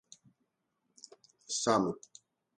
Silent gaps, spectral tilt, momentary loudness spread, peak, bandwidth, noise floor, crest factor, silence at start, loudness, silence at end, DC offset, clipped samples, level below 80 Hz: none; -3.5 dB/octave; 25 LU; -12 dBFS; 11 kHz; -81 dBFS; 24 dB; 1.5 s; -32 LUFS; 0.65 s; under 0.1%; under 0.1%; -74 dBFS